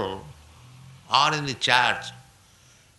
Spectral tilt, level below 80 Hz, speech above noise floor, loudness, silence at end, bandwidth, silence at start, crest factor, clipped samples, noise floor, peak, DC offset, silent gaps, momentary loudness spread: -2.5 dB/octave; -58 dBFS; 33 dB; -22 LUFS; 0.75 s; 12 kHz; 0 s; 24 dB; under 0.1%; -56 dBFS; -2 dBFS; under 0.1%; none; 17 LU